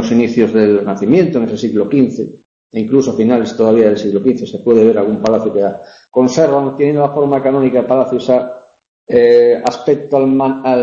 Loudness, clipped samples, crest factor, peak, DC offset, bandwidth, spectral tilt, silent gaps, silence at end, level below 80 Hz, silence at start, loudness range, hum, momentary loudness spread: -12 LUFS; under 0.1%; 12 dB; 0 dBFS; under 0.1%; 7.6 kHz; -7 dB/octave; 2.45-2.70 s, 8.88-9.07 s; 0 s; -52 dBFS; 0 s; 1 LU; none; 7 LU